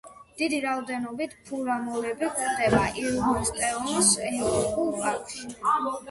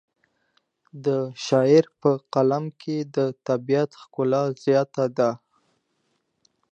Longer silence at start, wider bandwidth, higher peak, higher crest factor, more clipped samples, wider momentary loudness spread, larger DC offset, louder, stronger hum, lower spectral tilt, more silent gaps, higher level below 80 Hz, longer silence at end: second, 0.05 s vs 0.95 s; first, 12 kHz vs 8.2 kHz; second, -8 dBFS vs -4 dBFS; about the same, 18 dB vs 20 dB; neither; about the same, 11 LU vs 10 LU; neither; second, -26 LUFS vs -23 LUFS; neither; second, -3 dB/octave vs -7 dB/octave; neither; first, -50 dBFS vs -76 dBFS; second, 0 s vs 1.35 s